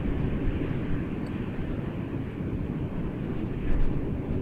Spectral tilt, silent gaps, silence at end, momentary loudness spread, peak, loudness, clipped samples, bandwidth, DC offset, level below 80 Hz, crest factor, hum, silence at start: -9.5 dB/octave; none; 0 s; 3 LU; -14 dBFS; -32 LUFS; under 0.1%; 4.6 kHz; under 0.1%; -32 dBFS; 16 dB; none; 0 s